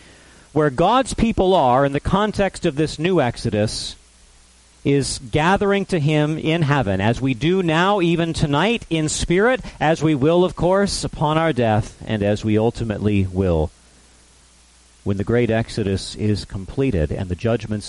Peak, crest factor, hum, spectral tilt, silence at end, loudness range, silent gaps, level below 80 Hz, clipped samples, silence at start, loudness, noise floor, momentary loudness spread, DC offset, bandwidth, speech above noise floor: -4 dBFS; 16 dB; none; -6 dB/octave; 0 s; 5 LU; none; -38 dBFS; under 0.1%; 0.55 s; -19 LUFS; -51 dBFS; 6 LU; under 0.1%; 11.5 kHz; 33 dB